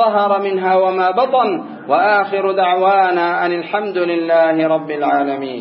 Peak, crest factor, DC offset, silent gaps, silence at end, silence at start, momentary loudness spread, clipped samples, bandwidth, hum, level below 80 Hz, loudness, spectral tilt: -2 dBFS; 12 dB; under 0.1%; none; 0 s; 0 s; 5 LU; under 0.1%; 5.8 kHz; none; -76 dBFS; -15 LUFS; -10.5 dB/octave